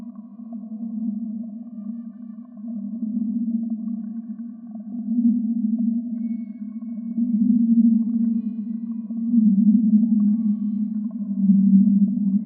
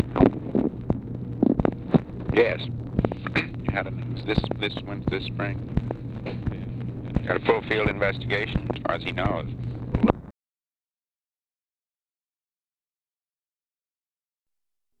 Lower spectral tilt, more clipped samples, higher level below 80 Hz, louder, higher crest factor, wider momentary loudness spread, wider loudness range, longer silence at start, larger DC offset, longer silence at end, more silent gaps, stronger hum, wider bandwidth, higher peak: first, -16 dB/octave vs -8.5 dB/octave; neither; second, -88 dBFS vs -42 dBFS; first, -22 LUFS vs -26 LUFS; second, 16 dB vs 26 dB; first, 18 LU vs 9 LU; first, 10 LU vs 5 LU; about the same, 0 s vs 0 s; neither; second, 0 s vs 4.7 s; neither; neither; second, 1.2 kHz vs 6.6 kHz; second, -6 dBFS vs 0 dBFS